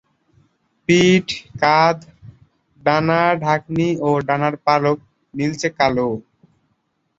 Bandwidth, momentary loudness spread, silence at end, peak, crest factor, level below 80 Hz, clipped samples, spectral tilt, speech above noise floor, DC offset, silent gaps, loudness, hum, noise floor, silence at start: 8 kHz; 12 LU; 1 s; -2 dBFS; 18 dB; -54 dBFS; under 0.1%; -5.5 dB/octave; 51 dB; under 0.1%; none; -18 LUFS; none; -68 dBFS; 0.9 s